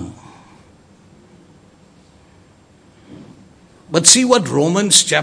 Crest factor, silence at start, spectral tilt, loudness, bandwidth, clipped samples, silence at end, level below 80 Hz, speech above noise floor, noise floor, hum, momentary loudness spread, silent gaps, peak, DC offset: 18 dB; 0 s; -2 dB/octave; -12 LUFS; 11 kHz; 0.1%; 0 s; -56 dBFS; 36 dB; -49 dBFS; none; 11 LU; none; 0 dBFS; under 0.1%